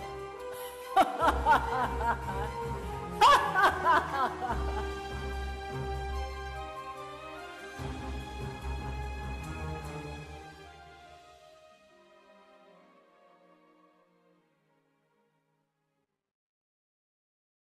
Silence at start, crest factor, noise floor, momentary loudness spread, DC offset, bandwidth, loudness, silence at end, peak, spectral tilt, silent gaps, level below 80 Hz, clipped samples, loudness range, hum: 0 s; 20 dB; -81 dBFS; 18 LU; under 0.1%; 14 kHz; -31 LUFS; 5.4 s; -14 dBFS; -4.5 dB/octave; none; -44 dBFS; under 0.1%; 17 LU; none